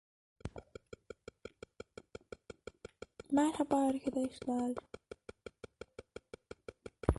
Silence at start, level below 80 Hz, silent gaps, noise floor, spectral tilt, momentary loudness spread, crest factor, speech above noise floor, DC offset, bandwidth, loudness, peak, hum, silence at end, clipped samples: 0.45 s; -52 dBFS; none; -55 dBFS; -6.5 dB/octave; 21 LU; 30 dB; 21 dB; under 0.1%; 11.5 kHz; -36 LUFS; -10 dBFS; none; 0 s; under 0.1%